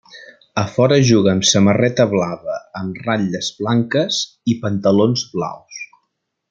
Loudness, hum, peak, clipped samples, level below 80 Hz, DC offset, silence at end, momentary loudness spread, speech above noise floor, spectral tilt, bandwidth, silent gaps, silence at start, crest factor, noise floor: -17 LUFS; none; 0 dBFS; under 0.1%; -56 dBFS; under 0.1%; 0.65 s; 14 LU; 56 dB; -5 dB/octave; 9.2 kHz; none; 0.15 s; 16 dB; -73 dBFS